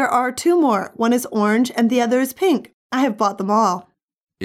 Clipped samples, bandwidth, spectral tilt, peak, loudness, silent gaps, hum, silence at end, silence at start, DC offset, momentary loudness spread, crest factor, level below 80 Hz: under 0.1%; 16 kHz; -5 dB/octave; -6 dBFS; -19 LUFS; 2.73-2.90 s, 4.04-4.08 s, 4.23-4.27 s; none; 0 s; 0 s; under 0.1%; 4 LU; 14 dB; -68 dBFS